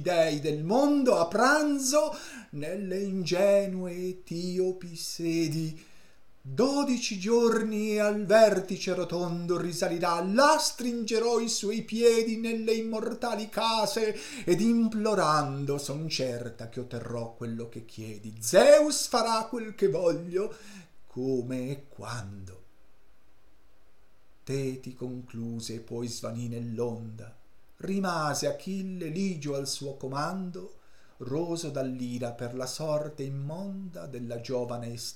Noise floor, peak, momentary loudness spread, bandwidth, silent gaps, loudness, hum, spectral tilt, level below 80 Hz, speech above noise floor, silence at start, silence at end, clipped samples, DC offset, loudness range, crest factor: -64 dBFS; -8 dBFS; 15 LU; 16.5 kHz; none; -28 LUFS; none; -4.5 dB/octave; -64 dBFS; 36 dB; 0 s; 0 s; under 0.1%; 0.4%; 12 LU; 22 dB